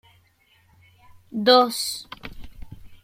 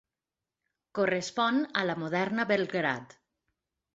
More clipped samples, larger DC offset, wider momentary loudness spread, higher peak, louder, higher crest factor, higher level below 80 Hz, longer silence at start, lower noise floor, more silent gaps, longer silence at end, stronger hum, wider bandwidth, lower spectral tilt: neither; neither; first, 23 LU vs 4 LU; first, -4 dBFS vs -10 dBFS; first, -20 LUFS vs -30 LUFS; about the same, 22 dB vs 20 dB; first, -50 dBFS vs -74 dBFS; first, 1.35 s vs 0.95 s; second, -61 dBFS vs under -90 dBFS; neither; second, 0.1 s vs 0.9 s; neither; first, 16.5 kHz vs 8 kHz; second, -3 dB/octave vs -5 dB/octave